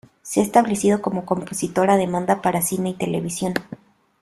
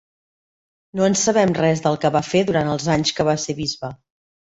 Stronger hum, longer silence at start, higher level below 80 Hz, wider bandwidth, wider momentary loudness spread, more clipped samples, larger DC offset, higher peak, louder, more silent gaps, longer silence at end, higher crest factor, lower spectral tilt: neither; second, 0.25 s vs 0.95 s; about the same, -56 dBFS vs -52 dBFS; first, 14.5 kHz vs 8.2 kHz; about the same, 8 LU vs 9 LU; neither; neither; about the same, -2 dBFS vs -4 dBFS; about the same, -21 LUFS vs -19 LUFS; neither; about the same, 0.45 s vs 0.55 s; about the same, 18 dB vs 18 dB; about the same, -5 dB/octave vs -4.5 dB/octave